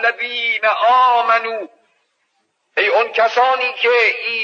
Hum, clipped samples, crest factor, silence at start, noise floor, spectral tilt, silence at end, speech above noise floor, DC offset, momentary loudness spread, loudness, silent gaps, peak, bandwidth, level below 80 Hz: none; under 0.1%; 14 dB; 0 s; -67 dBFS; -1 dB/octave; 0 s; 52 dB; under 0.1%; 10 LU; -15 LUFS; none; -4 dBFS; 7.2 kHz; under -90 dBFS